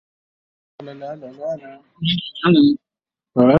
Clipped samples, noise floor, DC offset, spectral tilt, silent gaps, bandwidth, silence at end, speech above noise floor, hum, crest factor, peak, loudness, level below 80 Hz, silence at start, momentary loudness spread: under 0.1%; -89 dBFS; under 0.1%; -9 dB/octave; none; 5.8 kHz; 0 s; 69 dB; none; 20 dB; 0 dBFS; -18 LUFS; -58 dBFS; 0.8 s; 20 LU